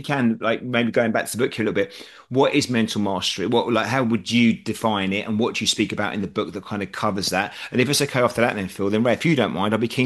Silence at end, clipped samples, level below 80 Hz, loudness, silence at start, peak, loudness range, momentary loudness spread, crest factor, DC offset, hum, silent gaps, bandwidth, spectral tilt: 0 s; under 0.1%; -60 dBFS; -22 LUFS; 0 s; -4 dBFS; 2 LU; 7 LU; 18 dB; under 0.1%; none; none; 12.5 kHz; -4.5 dB/octave